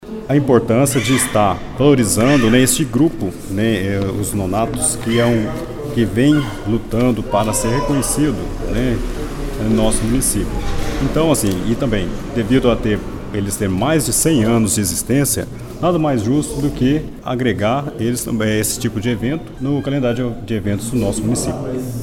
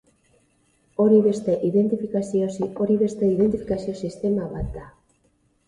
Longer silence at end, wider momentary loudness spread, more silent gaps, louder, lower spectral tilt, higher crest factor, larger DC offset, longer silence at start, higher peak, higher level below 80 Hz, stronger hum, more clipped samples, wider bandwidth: second, 0 s vs 0.8 s; second, 9 LU vs 13 LU; neither; first, -17 LUFS vs -22 LUFS; second, -5 dB/octave vs -8.5 dB/octave; about the same, 16 dB vs 18 dB; neither; second, 0 s vs 1 s; first, 0 dBFS vs -6 dBFS; first, -30 dBFS vs -46 dBFS; neither; neither; first, 18 kHz vs 10.5 kHz